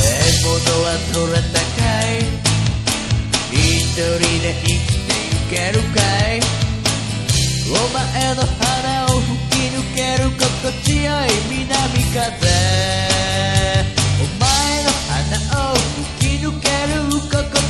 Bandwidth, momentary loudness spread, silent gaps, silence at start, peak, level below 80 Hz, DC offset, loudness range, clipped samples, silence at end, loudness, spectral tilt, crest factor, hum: 14 kHz; 4 LU; none; 0 s; 0 dBFS; -26 dBFS; 0.3%; 1 LU; under 0.1%; 0 s; -17 LUFS; -4 dB/octave; 16 dB; none